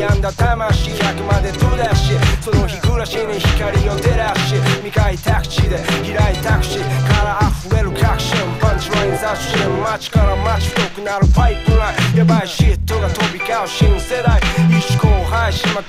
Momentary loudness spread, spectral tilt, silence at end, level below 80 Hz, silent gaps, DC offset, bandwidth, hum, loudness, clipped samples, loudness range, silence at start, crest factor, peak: 4 LU; -5.5 dB/octave; 0 s; -20 dBFS; none; under 0.1%; 15.5 kHz; none; -16 LUFS; under 0.1%; 1 LU; 0 s; 14 dB; 0 dBFS